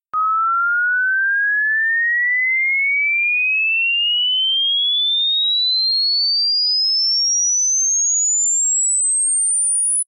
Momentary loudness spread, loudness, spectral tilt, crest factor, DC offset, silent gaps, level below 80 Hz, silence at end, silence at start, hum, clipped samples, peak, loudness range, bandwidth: 2 LU; -14 LUFS; 10 dB/octave; 4 dB; under 0.1%; none; -84 dBFS; 0.05 s; 0.15 s; none; under 0.1%; -14 dBFS; 1 LU; 10 kHz